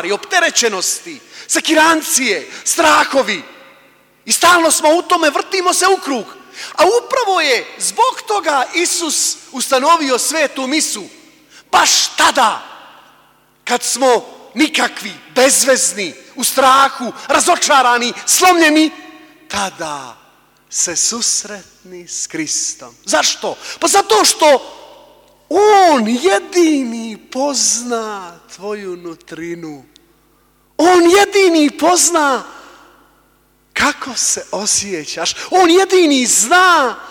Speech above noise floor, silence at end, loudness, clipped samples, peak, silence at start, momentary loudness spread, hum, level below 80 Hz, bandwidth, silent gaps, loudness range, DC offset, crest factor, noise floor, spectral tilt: 41 dB; 0 s; -13 LUFS; under 0.1%; 0 dBFS; 0 s; 15 LU; none; -58 dBFS; 19 kHz; none; 6 LU; under 0.1%; 14 dB; -55 dBFS; -1 dB/octave